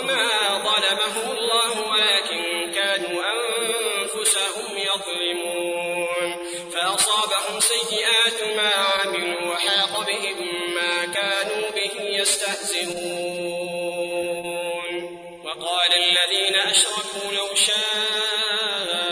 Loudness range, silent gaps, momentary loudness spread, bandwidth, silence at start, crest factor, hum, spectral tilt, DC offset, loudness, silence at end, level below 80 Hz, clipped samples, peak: 5 LU; none; 10 LU; 11 kHz; 0 s; 18 dB; none; 0 dB/octave; under 0.1%; -21 LUFS; 0 s; -66 dBFS; under 0.1%; -4 dBFS